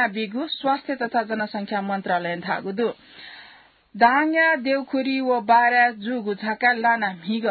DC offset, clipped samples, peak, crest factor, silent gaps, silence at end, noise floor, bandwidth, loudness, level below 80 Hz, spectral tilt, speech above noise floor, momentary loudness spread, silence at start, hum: under 0.1%; under 0.1%; -4 dBFS; 18 dB; none; 0 s; -51 dBFS; 4.8 kHz; -22 LUFS; -70 dBFS; -9.5 dB/octave; 29 dB; 10 LU; 0 s; none